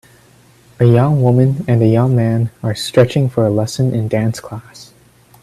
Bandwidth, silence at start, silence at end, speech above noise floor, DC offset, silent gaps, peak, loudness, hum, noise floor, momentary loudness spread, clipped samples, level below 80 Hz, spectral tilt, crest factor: 13 kHz; 0.8 s; 0.6 s; 34 dB; under 0.1%; none; 0 dBFS; -14 LUFS; none; -47 dBFS; 9 LU; under 0.1%; -48 dBFS; -7.5 dB/octave; 14 dB